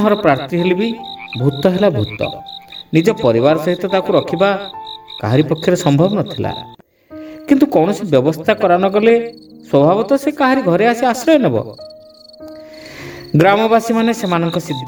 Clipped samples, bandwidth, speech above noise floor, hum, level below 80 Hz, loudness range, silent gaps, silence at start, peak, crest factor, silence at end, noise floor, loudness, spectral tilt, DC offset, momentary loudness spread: under 0.1%; 19.5 kHz; 25 dB; none; -50 dBFS; 3 LU; none; 0 s; 0 dBFS; 14 dB; 0 s; -39 dBFS; -14 LUFS; -6.5 dB/octave; under 0.1%; 18 LU